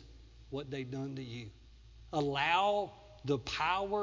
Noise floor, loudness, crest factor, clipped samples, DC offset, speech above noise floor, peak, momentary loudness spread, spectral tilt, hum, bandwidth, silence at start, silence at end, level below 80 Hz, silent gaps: -56 dBFS; -35 LUFS; 20 dB; under 0.1%; under 0.1%; 21 dB; -16 dBFS; 16 LU; -5 dB/octave; none; 7.6 kHz; 0 s; 0 s; -58 dBFS; none